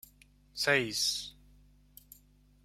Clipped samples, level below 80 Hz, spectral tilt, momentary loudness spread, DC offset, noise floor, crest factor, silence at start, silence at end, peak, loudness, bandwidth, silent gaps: under 0.1%; -64 dBFS; -2 dB/octave; 19 LU; under 0.1%; -63 dBFS; 24 dB; 0.55 s; 1.35 s; -12 dBFS; -30 LUFS; 16.5 kHz; none